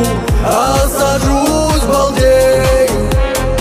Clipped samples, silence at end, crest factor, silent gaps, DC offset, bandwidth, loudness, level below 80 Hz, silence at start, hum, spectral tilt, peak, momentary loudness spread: under 0.1%; 0 s; 12 dB; none; under 0.1%; 16 kHz; -12 LUFS; -18 dBFS; 0 s; none; -5 dB/octave; 0 dBFS; 5 LU